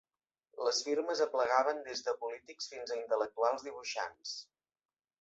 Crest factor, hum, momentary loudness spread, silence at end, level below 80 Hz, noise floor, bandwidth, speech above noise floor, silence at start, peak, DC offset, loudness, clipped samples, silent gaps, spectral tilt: 22 dB; none; 13 LU; 0.8 s; -82 dBFS; -79 dBFS; 8 kHz; 44 dB; 0.55 s; -14 dBFS; under 0.1%; -35 LUFS; under 0.1%; none; 1 dB/octave